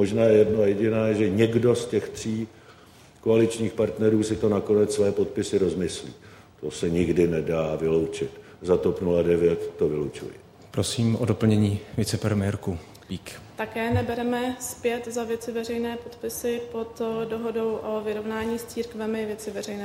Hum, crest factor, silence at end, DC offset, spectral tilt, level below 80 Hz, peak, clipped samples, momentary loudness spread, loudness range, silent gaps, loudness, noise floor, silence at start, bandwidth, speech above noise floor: none; 18 dB; 0 s; under 0.1%; -6 dB/octave; -52 dBFS; -6 dBFS; under 0.1%; 12 LU; 6 LU; none; -25 LUFS; -51 dBFS; 0 s; 16 kHz; 27 dB